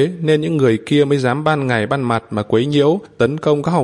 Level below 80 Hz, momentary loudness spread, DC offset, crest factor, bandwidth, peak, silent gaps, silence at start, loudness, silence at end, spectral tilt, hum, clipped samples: -54 dBFS; 4 LU; under 0.1%; 14 dB; 11 kHz; -2 dBFS; none; 0 s; -16 LUFS; 0 s; -7 dB/octave; none; under 0.1%